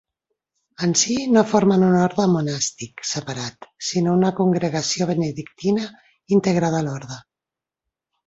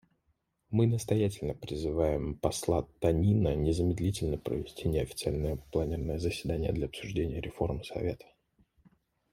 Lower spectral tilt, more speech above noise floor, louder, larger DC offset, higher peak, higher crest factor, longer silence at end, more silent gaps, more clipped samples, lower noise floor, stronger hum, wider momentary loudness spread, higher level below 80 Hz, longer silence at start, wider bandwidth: second, -5 dB/octave vs -6.5 dB/octave; first, 68 dB vs 46 dB; first, -20 LUFS vs -32 LUFS; neither; first, -2 dBFS vs -12 dBFS; about the same, 20 dB vs 20 dB; about the same, 1.05 s vs 1.15 s; neither; neither; first, -88 dBFS vs -76 dBFS; neither; first, 13 LU vs 8 LU; second, -58 dBFS vs -46 dBFS; about the same, 0.8 s vs 0.7 s; second, 8 kHz vs 16 kHz